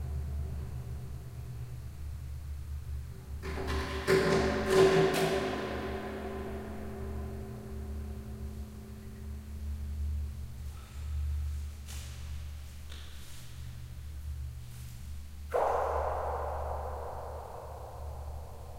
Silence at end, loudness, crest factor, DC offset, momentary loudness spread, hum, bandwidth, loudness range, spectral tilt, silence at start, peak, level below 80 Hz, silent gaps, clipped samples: 0 s; -35 LUFS; 24 dB; under 0.1%; 17 LU; none; 16 kHz; 13 LU; -6 dB/octave; 0 s; -12 dBFS; -42 dBFS; none; under 0.1%